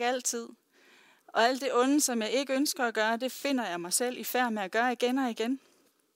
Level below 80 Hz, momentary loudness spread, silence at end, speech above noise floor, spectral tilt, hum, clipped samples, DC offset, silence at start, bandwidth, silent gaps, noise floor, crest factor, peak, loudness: under -90 dBFS; 7 LU; 0.6 s; 32 dB; -2 dB/octave; none; under 0.1%; under 0.1%; 0 s; 16 kHz; none; -61 dBFS; 20 dB; -10 dBFS; -29 LUFS